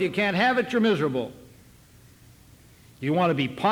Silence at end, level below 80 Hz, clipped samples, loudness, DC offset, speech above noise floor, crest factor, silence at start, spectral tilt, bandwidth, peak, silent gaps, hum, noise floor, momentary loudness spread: 0 s; -60 dBFS; under 0.1%; -24 LUFS; under 0.1%; 29 dB; 16 dB; 0 s; -6.5 dB/octave; 19 kHz; -10 dBFS; none; none; -53 dBFS; 10 LU